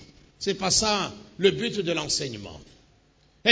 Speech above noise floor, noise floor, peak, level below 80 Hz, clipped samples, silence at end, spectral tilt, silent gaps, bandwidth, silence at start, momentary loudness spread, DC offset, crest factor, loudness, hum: 35 dB; -61 dBFS; -2 dBFS; -54 dBFS; under 0.1%; 0 s; -2.5 dB/octave; none; 8 kHz; 0 s; 13 LU; under 0.1%; 26 dB; -25 LUFS; none